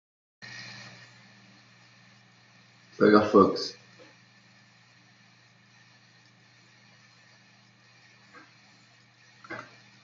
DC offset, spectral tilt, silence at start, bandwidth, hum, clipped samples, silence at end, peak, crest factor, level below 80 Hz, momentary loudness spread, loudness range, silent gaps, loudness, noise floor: under 0.1%; -6 dB/octave; 0.45 s; 7.4 kHz; none; under 0.1%; 0.45 s; -6 dBFS; 26 dB; -78 dBFS; 30 LU; 23 LU; none; -23 LUFS; -59 dBFS